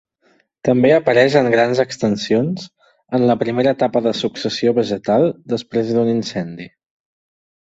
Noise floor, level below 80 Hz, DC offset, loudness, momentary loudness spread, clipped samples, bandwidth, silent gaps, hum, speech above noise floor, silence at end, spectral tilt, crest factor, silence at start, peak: -59 dBFS; -58 dBFS; under 0.1%; -17 LUFS; 11 LU; under 0.1%; 8 kHz; none; none; 43 dB; 1.05 s; -6 dB/octave; 16 dB; 0.65 s; -2 dBFS